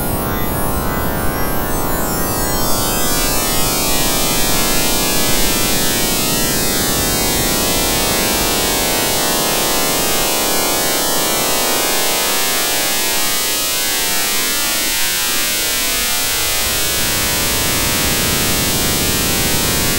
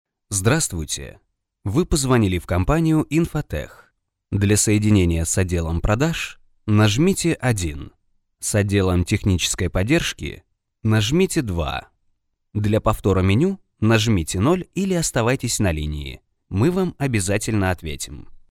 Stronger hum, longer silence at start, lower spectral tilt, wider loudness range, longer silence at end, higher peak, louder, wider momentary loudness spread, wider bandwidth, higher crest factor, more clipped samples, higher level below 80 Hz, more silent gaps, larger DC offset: neither; second, 0 s vs 0.3 s; second, -2 dB/octave vs -5 dB/octave; about the same, 1 LU vs 2 LU; second, 0 s vs 0.15 s; first, 0 dBFS vs -4 dBFS; first, -14 LUFS vs -20 LUFS; second, 4 LU vs 12 LU; about the same, 16 kHz vs 16 kHz; about the same, 14 dB vs 16 dB; neither; first, -28 dBFS vs -36 dBFS; neither; neither